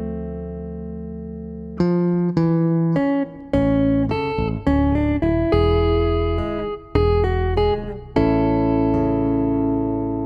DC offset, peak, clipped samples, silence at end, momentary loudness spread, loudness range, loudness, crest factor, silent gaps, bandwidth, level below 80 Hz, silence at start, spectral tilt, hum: under 0.1%; -4 dBFS; under 0.1%; 0 s; 13 LU; 2 LU; -20 LUFS; 16 dB; none; 5.6 kHz; -30 dBFS; 0 s; -9.5 dB/octave; none